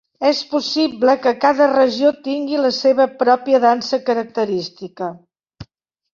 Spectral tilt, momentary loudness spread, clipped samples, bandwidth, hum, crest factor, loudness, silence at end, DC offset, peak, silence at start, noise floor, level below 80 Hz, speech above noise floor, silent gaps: -4.5 dB/octave; 10 LU; under 0.1%; 7.4 kHz; none; 16 dB; -17 LUFS; 0.5 s; under 0.1%; 0 dBFS; 0.2 s; -60 dBFS; -60 dBFS; 44 dB; none